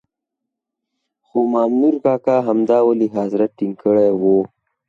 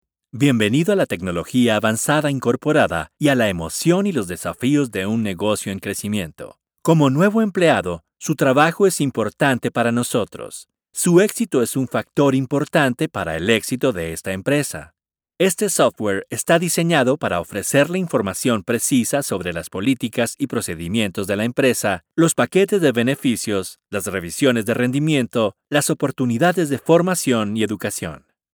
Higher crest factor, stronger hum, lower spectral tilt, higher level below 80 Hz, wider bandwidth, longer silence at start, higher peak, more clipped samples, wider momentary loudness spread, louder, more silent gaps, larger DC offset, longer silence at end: about the same, 14 dB vs 18 dB; neither; first, -9.5 dB/octave vs -5 dB/octave; second, -64 dBFS vs -52 dBFS; second, 7.2 kHz vs over 20 kHz; first, 1.35 s vs 0.35 s; second, -4 dBFS vs 0 dBFS; neither; second, 6 LU vs 9 LU; about the same, -17 LUFS vs -19 LUFS; neither; neither; about the same, 0.45 s vs 0.4 s